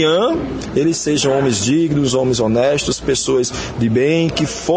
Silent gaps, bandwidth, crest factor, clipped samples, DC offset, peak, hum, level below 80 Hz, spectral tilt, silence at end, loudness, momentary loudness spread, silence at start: none; 9.8 kHz; 14 dB; under 0.1%; under 0.1%; -2 dBFS; none; -40 dBFS; -4.5 dB/octave; 0 s; -16 LUFS; 4 LU; 0 s